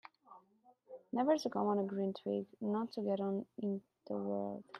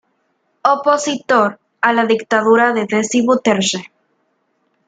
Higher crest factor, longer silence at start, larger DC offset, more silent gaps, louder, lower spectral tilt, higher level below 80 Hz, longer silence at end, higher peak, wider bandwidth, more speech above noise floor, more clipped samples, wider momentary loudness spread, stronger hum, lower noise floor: about the same, 18 dB vs 16 dB; second, 0.3 s vs 0.65 s; neither; neither; second, -38 LUFS vs -15 LUFS; first, -7 dB/octave vs -3.5 dB/octave; second, -86 dBFS vs -64 dBFS; second, 0 s vs 1 s; second, -20 dBFS vs 0 dBFS; about the same, 9.4 kHz vs 9.4 kHz; second, 32 dB vs 50 dB; neither; first, 11 LU vs 6 LU; neither; first, -69 dBFS vs -65 dBFS